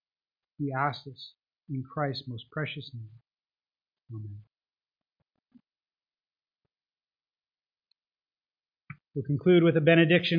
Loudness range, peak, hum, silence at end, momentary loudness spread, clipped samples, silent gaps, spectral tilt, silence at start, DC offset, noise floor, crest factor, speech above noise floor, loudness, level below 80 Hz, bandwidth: 23 LU; -8 dBFS; none; 0 s; 24 LU; under 0.1%; none; -9 dB/octave; 0.6 s; under 0.1%; under -90 dBFS; 24 dB; over 63 dB; -26 LUFS; -70 dBFS; 5.2 kHz